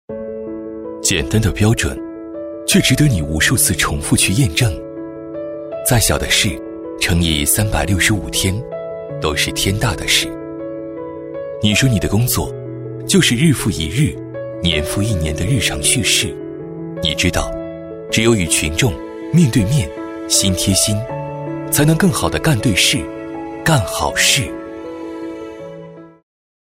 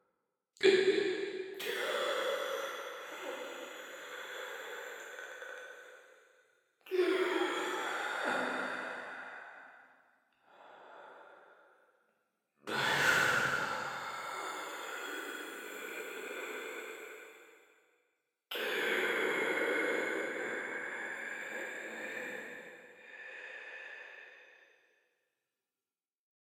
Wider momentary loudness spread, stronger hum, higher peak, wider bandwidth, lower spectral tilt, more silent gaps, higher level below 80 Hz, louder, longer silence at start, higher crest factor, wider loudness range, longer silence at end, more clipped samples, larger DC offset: second, 15 LU vs 20 LU; neither; first, 0 dBFS vs -14 dBFS; second, 16 kHz vs 19.5 kHz; about the same, -3.5 dB/octave vs -2.5 dB/octave; neither; first, -34 dBFS vs -80 dBFS; first, -15 LUFS vs -36 LUFS; second, 0.1 s vs 0.6 s; second, 16 dB vs 24 dB; second, 3 LU vs 14 LU; second, 0.5 s vs 1.95 s; neither; neither